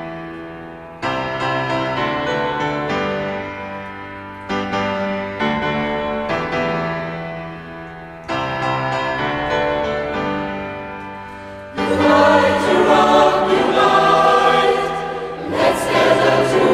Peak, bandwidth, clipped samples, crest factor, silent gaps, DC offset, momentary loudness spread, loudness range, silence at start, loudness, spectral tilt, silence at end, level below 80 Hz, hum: 0 dBFS; 14.5 kHz; under 0.1%; 18 dB; none; under 0.1%; 19 LU; 9 LU; 0 s; -17 LUFS; -5 dB/octave; 0 s; -44 dBFS; none